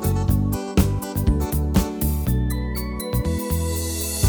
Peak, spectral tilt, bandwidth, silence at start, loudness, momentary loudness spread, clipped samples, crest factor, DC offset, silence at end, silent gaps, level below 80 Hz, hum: -4 dBFS; -6 dB/octave; over 20 kHz; 0 s; -23 LUFS; 4 LU; under 0.1%; 18 dB; under 0.1%; 0 s; none; -26 dBFS; none